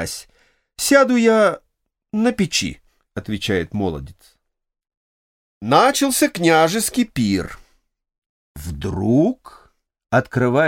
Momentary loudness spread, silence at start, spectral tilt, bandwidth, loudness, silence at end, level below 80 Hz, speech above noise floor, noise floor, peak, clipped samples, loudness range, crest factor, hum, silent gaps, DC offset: 18 LU; 0 s; -4.5 dB/octave; 17 kHz; -18 LUFS; 0 s; -46 dBFS; 46 dB; -64 dBFS; 0 dBFS; under 0.1%; 5 LU; 20 dB; none; 4.97-5.61 s, 8.18-8.55 s; under 0.1%